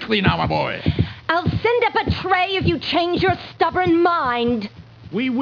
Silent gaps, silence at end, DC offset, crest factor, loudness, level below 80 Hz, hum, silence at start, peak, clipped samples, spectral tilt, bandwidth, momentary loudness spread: none; 0 s; under 0.1%; 16 dB; -19 LUFS; -40 dBFS; none; 0 s; -4 dBFS; under 0.1%; -7.5 dB/octave; 5.4 kHz; 6 LU